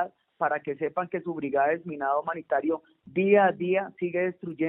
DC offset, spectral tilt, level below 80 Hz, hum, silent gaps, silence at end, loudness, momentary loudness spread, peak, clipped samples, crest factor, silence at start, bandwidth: under 0.1%; -5.5 dB/octave; -74 dBFS; none; none; 0 s; -27 LUFS; 10 LU; -8 dBFS; under 0.1%; 18 dB; 0 s; 3.8 kHz